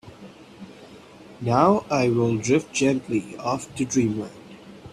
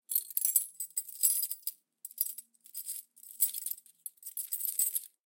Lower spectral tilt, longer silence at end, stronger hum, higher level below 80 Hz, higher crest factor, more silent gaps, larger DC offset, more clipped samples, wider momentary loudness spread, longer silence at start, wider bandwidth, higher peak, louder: first, -5.5 dB/octave vs 6 dB/octave; second, 0 s vs 0.25 s; neither; first, -58 dBFS vs under -90 dBFS; second, 20 dB vs 26 dB; neither; neither; neither; first, 24 LU vs 18 LU; about the same, 0.05 s vs 0.1 s; second, 12.5 kHz vs 17 kHz; first, -4 dBFS vs -10 dBFS; first, -23 LUFS vs -32 LUFS